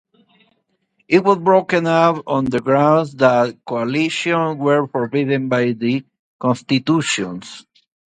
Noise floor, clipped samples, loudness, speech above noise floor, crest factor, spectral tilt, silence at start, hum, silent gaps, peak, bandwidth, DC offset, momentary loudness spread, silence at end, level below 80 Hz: -66 dBFS; under 0.1%; -17 LUFS; 49 dB; 18 dB; -5.5 dB/octave; 1.1 s; none; 6.19-6.39 s; 0 dBFS; 9.4 kHz; under 0.1%; 7 LU; 0.5 s; -58 dBFS